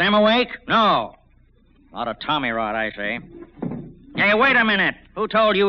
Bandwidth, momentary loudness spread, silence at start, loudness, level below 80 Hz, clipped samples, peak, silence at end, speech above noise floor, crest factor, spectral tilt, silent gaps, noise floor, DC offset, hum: 6.4 kHz; 16 LU; 0 s; -19 LUFS; -50 dBFS; under 0.1%; -6 dBFS; 0 s; 35 dB; 14 dB; -2 dB/octave; none; -55 dBFS; under 0.1%; none